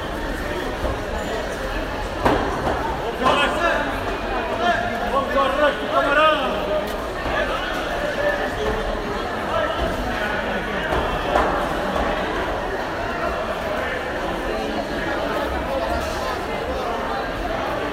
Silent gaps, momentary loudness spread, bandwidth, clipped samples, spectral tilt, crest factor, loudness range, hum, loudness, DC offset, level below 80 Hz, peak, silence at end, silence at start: none; 7 LU; 16 kHz; under 0.1%; -5 dB/octave; 18 dB; 4 LU; none; -22 LUFS; under 0.1%; -34 dBFS; -4 dBFS; 0 s; 0 s